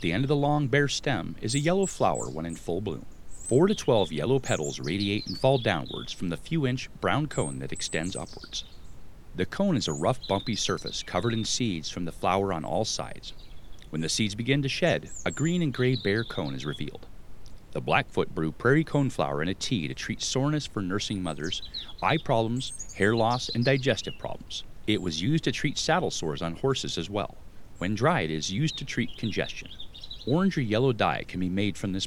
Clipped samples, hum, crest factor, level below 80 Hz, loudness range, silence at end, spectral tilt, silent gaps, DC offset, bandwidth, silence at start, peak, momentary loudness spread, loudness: under 0.1%; none; 22 dB; -48 dBFS; 3 LU; 0 s; -5 dB/octave; none; under 0.1%; 15.5 kHz; 0 s; -6 dBFS; 11 LU; -28 LUFS